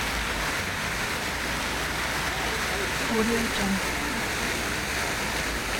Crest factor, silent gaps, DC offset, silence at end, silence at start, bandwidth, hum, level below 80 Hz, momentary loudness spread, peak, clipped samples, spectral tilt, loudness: 16 dB; none; under 0.1%; 0 s; 0 s; 19.5 kHz; none; -40 dBFS; 3 LU; -12 dBFS; under 0.1%; -3 dB/octave; -27 LUFS